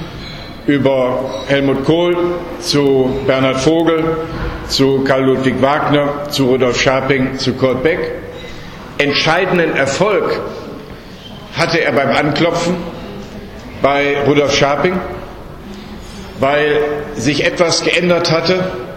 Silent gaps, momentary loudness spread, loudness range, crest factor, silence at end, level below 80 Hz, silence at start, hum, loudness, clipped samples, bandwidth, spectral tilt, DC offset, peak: none; 18 LU; 3 LU; 14 dB; 0 s; -36 dBFS; 0 s; none; -14 LUFS; under 0.1%; 16.5 kHz; -5 dB/octave; under 0.1%; 0 dBFS